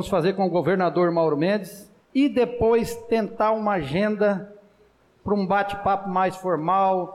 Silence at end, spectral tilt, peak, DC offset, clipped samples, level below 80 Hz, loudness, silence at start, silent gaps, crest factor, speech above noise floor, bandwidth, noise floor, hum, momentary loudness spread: 0 s; -7 dB/octave; -12 dBFS; under 0.1%; under 0.1%; -52 dBFS; -23 LUFS; 0 s; none; 10 dB; 36 dB; 15.5 kHz; -59 dBFS; none; 5 LU